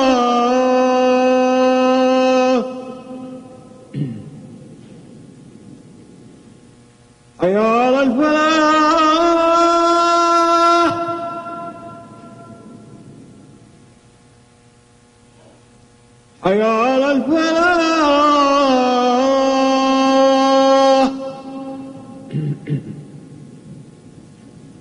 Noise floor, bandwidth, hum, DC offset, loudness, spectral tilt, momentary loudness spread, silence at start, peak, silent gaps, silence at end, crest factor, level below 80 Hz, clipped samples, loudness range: -50 dBFS; 10.5 kHz; none; under 0.1%; -14 LUFS; -5 dB/octave; 19 LU; 0 s; -2 dBFS; none; 1 s; 14 dB; -54 dBFS; under 0.1%; 18 LU